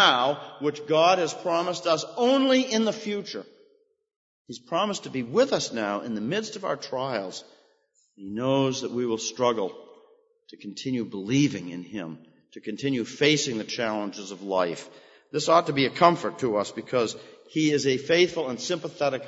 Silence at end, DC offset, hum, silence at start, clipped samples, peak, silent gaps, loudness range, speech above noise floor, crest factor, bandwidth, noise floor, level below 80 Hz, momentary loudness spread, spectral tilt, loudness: 0 s; under 0.1%; none; 0 s; under 0.1%; -2 dBFS; 4.16-4.45 s; 5 LU; 42 dB; 24 dB; 8 kHz; -67 dBFS; -72 dBFS; 16 LU; -4 dB/octave; -26 LUFS